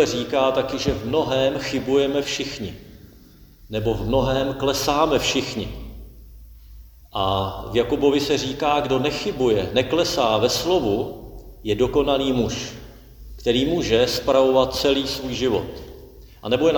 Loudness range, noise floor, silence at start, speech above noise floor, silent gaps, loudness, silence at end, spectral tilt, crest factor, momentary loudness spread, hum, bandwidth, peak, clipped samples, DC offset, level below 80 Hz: 3 LU; -48 dBFS; 0 s; 27 dB; none; -21 LUFS; 0 s; -4.5 dB/octave; 18 dB; 14 LU; none; over 20 kHz; -4 dBFS; under 0.1%; under 0.1%; -40 dBFS